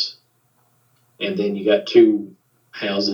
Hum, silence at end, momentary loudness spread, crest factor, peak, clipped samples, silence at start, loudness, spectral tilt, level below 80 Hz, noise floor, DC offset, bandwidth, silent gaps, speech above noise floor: none; 0 s; 16 LU; 20 dB; -2 dBFS; under 0.1%; 0 s; -19 LUFS; -6 dB/octave; -84 dBFS; -62 dBFS; under 0.1%; 6.8 kHz; none; 45 dB